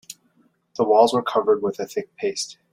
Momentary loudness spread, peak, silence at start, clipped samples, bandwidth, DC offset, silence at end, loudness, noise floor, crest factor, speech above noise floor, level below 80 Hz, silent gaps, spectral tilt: 13 LU; -4 dBFS; 0.1 s; under 0.1%; 15.5 kHz; under 0.1%; 0.2 s; -21 LUFS; -63 dBFS; 20 dB; 42 dB; -68 dBFS; none; -4 dB/octave